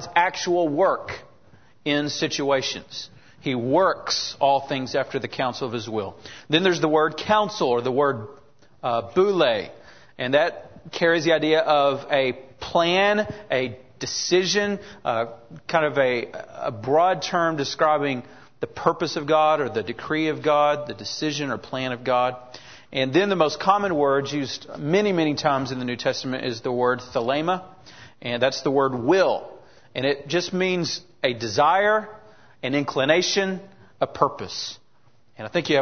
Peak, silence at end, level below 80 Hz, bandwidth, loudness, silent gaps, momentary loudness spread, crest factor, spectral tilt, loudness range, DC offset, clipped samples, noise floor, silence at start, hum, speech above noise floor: -4 dBFS; 0 s; -62 dBFS; 6.6 kHz; -23 LUFS; none; 12 LU; 20 dB; -4.5 dB/octave; 3 LU; 0.2%; under 0.1%; -62 dBFS; 0 s; none; 39 dB